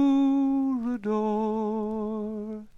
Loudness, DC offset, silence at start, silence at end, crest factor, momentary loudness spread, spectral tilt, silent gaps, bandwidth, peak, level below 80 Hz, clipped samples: -27 LUFS; under 0.1%; 0 s; 0.05 s; 12 dB; 10 LU; -8.5 dB/octave; none; 6.6 kHz; -14 dBFS; -58 dBFS; under 0.1%